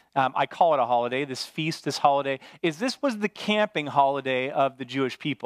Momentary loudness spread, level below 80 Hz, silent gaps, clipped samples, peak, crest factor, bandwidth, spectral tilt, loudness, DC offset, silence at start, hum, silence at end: 7 LU; -78 dBFS; none; under 0.1%; -6 dBFS; 18 dB; 15 kHz; -5 dB/octave; -25 LUFS; under 0.1%; 0.15 s; none; 0 s